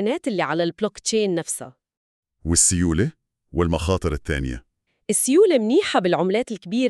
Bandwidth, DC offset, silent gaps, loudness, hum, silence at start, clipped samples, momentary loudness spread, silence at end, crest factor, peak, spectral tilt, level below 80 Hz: 13.5 kHz; under 0.1%; 1.97-2.23 s; -21 LUFS; none; 0 s; under 0.1%; 14 LU; 0 s; 18 dB; -2 dBFS; -4 dB/octave; -38 dBFS